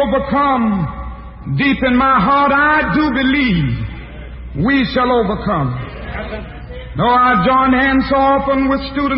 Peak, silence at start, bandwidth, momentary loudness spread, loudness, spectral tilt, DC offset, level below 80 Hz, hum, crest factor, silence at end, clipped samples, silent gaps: -2 dBFS; 0 s; 5.8 kHz; 17 LU; -14 LUFS; -11.5 dB/octave; under 0.1%; -32 dBFS; none; 12 dB; 0 s; under 0.1%; none